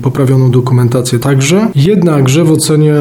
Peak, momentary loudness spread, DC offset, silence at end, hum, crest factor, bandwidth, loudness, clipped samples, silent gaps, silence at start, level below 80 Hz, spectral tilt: 0 dBFS; 2 LU; under 0.1%; 0 s; none; 8 dB; 16.5 kHz; -9 LUFS; under 0.1%; none; 0 s; -42 dBFS; -6 dB/octave